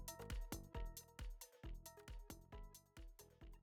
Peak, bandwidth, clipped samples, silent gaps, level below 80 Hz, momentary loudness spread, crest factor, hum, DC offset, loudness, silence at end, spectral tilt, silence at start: -34 dBFS; over 20 kHz; under 0.1%; none; -54 dBFS; 11 LU; 20 dB; none; under 0.1%; -56 LUFS; 0 s; -4 dB/octave; 0 s